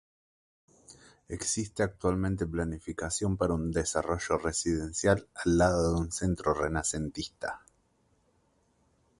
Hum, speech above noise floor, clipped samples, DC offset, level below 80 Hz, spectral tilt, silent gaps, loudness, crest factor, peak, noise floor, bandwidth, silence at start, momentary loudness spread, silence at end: none; 40 dB; under 0.1%; under 0.1%; -46 dBFS; -5 dB/octave; none; -30 LUFS; 20 dB; -10 dBFS; -70 dBFS; 11.5 kHz; 0.9 s; 10 LU; 1.6 s